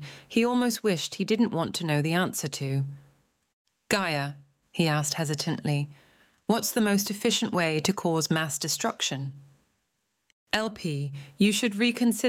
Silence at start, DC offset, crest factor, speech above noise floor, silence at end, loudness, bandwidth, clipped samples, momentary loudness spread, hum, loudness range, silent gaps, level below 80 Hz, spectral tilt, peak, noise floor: 0 s; under 0.1%; 20 dB; 51 dB; 0 s; -27 LUFS; 17 kHz; under 0.1%; 8 LU; none; 3 LU; 3.53-3.65 s, 10.32-10.47 s; -66 dBFS; -4.5 dB/octave; -8 dBFS; -77 dBFS